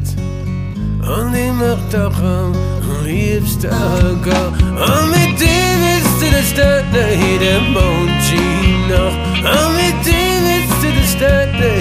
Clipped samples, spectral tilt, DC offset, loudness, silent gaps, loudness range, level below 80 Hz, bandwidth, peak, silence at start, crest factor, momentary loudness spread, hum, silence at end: under 0.1%; -5 dB/octave; under 0.1%; -14 LUFS; none; 4 LU; -22 dBFS; 15.5 kHz; 0 dBFS; 0 s; 12 dB; 6 LU; none; 0 s